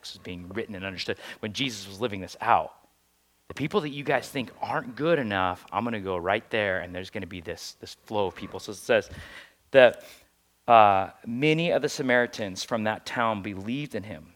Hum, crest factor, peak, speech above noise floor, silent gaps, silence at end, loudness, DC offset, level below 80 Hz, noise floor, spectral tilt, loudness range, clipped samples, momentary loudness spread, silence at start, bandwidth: none; 26 dB; -2 dBFS; 41 dB; none; 0.1 s; -26 LUFS; under 0.1%; -64 dBFS; -67 dBFS; -5 dB/octave; 8 LU; under 0.1%; 17 LU; 0.05 s; 17 kHz